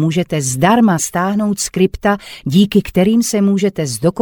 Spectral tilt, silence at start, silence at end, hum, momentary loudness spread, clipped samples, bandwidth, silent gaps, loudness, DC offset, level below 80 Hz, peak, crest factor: -5.5 dB/octave; 0 s; 0 s; none; 6 LU; under 0.1%; 19.5 kHz; none; -15 LUFS; under 0.1%; -40 dBFS; 0 dBFS; 14 dB